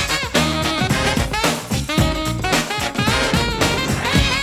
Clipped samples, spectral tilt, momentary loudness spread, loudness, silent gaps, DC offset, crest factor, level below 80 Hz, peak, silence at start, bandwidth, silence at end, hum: under 0.1%; -4 dB/octave; 3 LU; -18 LUFS; none; under 0.1%; 18 dB; -30 dBFS; -2 dBFS; 0 s; 19 kHz; 0 s; none